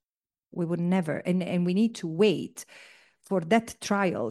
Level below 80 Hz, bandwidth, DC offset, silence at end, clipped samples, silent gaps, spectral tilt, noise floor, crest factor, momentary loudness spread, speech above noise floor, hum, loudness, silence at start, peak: -70 dBFS; 12.5 kHz; under 0.1%; 0 s; under 0.1%; none; -6 dB/octave; under -90 dBFS; 18 dB; 13 LU; over 63 dB; none; -27 LUFS; 0.55 s; -8 dBFS